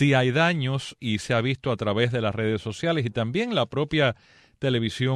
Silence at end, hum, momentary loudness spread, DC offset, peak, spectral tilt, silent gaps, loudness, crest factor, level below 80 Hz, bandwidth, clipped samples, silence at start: 0 s; none; 7 LU; under 0.1%; -10 dBFS; -6 dB/octave; none; -25 LUFS; 16 dB; -56 dBFS; 10.5 kHz; under 0.1%; 0 s